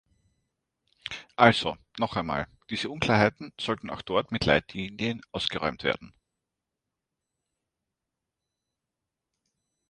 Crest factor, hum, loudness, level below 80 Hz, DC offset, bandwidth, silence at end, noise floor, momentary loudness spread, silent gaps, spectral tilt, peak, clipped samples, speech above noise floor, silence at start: 28 dB; none; -27 LUFS; -54 dBFS; under 0.1%; 10 kHz; 3.8 s; -87 dBFS; 14 LU; none; -5.5 dB/octave; -2 dBFS; under 0.1%; 59 dB; 1.1 s